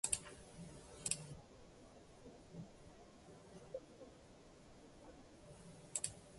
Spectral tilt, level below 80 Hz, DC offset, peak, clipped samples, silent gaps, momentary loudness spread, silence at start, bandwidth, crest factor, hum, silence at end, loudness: -2 dB/octave; -68 dBFS; under 0.1%; -16 dBFS; under 0.1%; none; 19 LU; 0.05 s; 11.5 kHz; 34 dB; none; 0 s; -48 LUFS